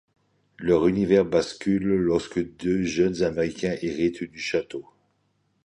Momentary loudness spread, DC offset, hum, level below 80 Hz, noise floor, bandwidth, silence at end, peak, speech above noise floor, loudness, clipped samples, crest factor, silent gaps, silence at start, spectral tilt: 9 LU; under 0.1%; none; -52 dBFS; -70 dBFS; 10.5 kHz; 0.85 s; -6 dBFS; 46 dB; -24 LUFS; under 0.1%; 18 dB; none; 0.6 s; -6.5 dB/octave